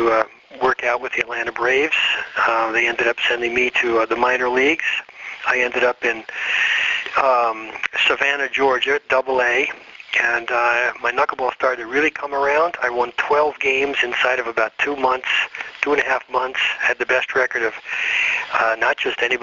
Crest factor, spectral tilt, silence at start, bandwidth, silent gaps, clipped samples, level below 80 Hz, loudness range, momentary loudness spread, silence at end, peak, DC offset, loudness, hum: 20 dB; 1 dB/octave; 0 s; 7.6 kHz; none; under 0.1%; -56 dBFS; 2 LU; 5 LU; 0 s; 0 dBFS; under 0.1%; -19 LUFS; none